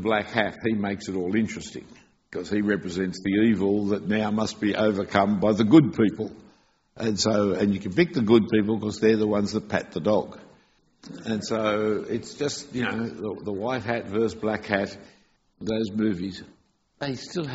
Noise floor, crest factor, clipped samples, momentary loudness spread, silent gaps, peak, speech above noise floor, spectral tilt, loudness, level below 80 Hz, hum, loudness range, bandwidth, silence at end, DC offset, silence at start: -61 dBFS; 20 dB; under 0.1%; 12 LU; none; -4 dBFS; 37 dB; -5 dB/octave; -25 LUFS; -58 dBFS; none; 7 LU; 8 kHz; 0 s; under 0.1%; 0 s